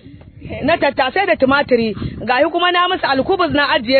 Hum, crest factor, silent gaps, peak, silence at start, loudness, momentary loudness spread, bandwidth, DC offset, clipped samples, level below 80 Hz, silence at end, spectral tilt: none; 16 dB; none; 0 dBFS; 0.05 s; -15 LUFS; 7 LU; 4.6 kHz; under 0.1%; under 0.1%; -42 dBFS; 0 s; -8 dB/octave